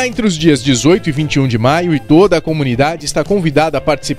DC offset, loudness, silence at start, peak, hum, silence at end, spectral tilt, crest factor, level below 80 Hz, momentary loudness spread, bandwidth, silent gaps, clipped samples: under 0.1%; -13 LUFS; 0 s; 0 dBFS; none; 0 s; -5.5 dB/octave; 12 dB; -34 dBFS; 5 LU; 14.5 kHz; none; under 0.1%